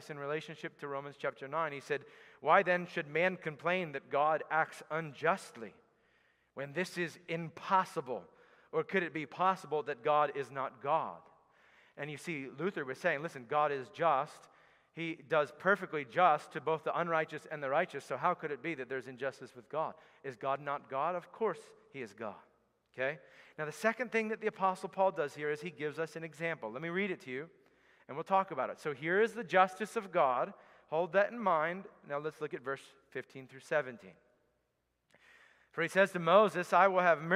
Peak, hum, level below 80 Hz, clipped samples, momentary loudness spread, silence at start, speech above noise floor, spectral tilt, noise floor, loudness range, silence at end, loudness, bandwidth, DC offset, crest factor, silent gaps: -12 dBFS; none; -86 dBFS; under 0.1%; 15 LU; 0 s; 47 dB; -5.5 dB/octave; -81 dBFS; 6 LU; 0 s; -34 LUFS; 15 kHz; under 0.1%; 24 dB; none